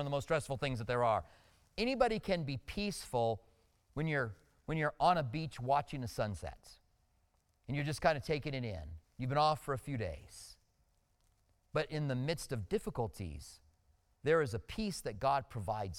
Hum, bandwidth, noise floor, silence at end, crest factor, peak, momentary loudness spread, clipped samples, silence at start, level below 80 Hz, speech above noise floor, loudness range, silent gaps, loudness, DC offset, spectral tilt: none; 16.5 kHz; -75 dBFS; 0 s; 20 dB; -16 dBFS; 14 LU; under 0.1%; 0 s; -56 dBFS; 39 dB; 5 LU; none; -37 LUFS; under 0.1%; -5.5 dB/octave